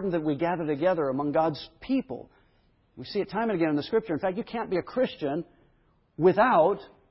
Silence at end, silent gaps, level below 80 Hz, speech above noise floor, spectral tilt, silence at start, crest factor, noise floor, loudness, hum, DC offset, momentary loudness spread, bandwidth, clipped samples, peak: 0.25 s; none; -60 dBFS; 39 dB; -10.5 dB/octave; 0 s; 18 dB; -65 dBFS; -27 LUFS; none; under 0.1%; 14 LU; 5.8 kHz; under 0.1%; -10 dBFS